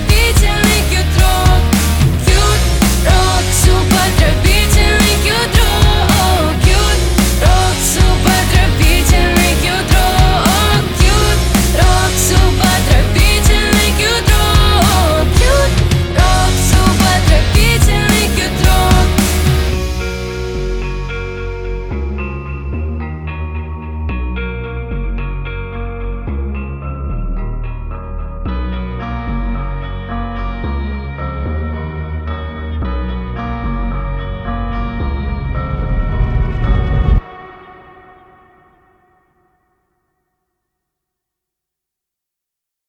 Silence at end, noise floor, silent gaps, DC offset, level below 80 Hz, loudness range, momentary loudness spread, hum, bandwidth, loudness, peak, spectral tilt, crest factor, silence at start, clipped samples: 5.15 s; -82 dBFS; none; under 0.1%; -16 dBFS; 12 LU; 13 LU; none; 19.5 kHz; -14 LUFS; 0 dBFS; -4.5 dB/octave; 12 dB; 0 s; under 0.1%